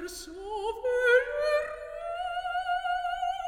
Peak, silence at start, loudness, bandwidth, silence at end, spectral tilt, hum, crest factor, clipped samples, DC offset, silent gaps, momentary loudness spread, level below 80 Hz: -12 dBFS; 0 s; -29 LUFS; 17 kHz; 0 s; -2 dB/octave; none; 18 dB; under 0.1%; under 0.1%; none; 14 LU; -56 dBFS